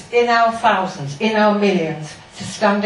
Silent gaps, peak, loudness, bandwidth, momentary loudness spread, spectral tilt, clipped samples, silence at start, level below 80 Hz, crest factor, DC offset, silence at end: none; -2 dBFS; -17 LUFS; 11 kHz; 15 LU; -5 dB/octave; under 0.1%; 0 s; -56 dBFS; 16 dB; under 0.1%; 0 s